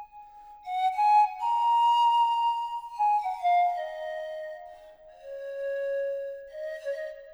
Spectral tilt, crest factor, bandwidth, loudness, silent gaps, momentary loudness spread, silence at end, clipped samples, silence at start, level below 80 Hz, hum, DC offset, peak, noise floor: 0.5 dB/octave; 14 dB; over 20 kHz; -27 LUFS; none; 18 LU; 0 s; under 0.1%; 0 s; -68 dBFS; none; under 0.1%; -14 dBFS; -50 dBFS